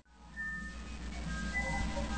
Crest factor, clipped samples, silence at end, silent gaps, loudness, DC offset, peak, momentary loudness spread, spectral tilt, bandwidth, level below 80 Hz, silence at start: 16 dB; under 0.1%; 0 s; none; -39 LUFS; under 0.1%; -24 dBFS; 10 LU; -4.5 dB/octave; 9.2 kHz; -42 dBFS; 0 s